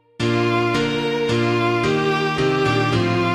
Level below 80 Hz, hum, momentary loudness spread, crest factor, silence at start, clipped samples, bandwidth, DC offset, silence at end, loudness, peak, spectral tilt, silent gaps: -46 dBFS; none; 2 LU; 12 dB; 0.2 s; under 0.1%; 12.5 kHz; under 0.1%; 0 s; -19 LUFS; -8 dBFS; -6 dB/octave; none